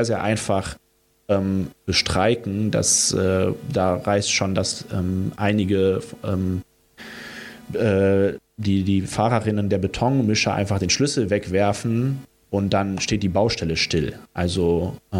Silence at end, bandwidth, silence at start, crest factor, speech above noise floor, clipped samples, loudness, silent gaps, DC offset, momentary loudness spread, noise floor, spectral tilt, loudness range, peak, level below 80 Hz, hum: 0 s; 16 kHz; 0 s; 16 dB; 21 dB; under 0.1%; -21 LUFS; none; under 0.1%; 8 LU; -42 dBFS; -4.5 dB/octave; 3 LU; -6 dBFS; -48 dBFS; none